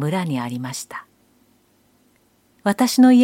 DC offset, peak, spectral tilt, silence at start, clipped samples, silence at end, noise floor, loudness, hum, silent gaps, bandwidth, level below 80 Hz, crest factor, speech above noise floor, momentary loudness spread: under 0.1%; -2 dBFS; -5.5 dB/octave; 0 s; under 0.1%; 0 s; -60 dBFS; -20 LUFS; none; none; 16.5 kHz; -68 dBFS; 18 dB; 43 dB; 18 LU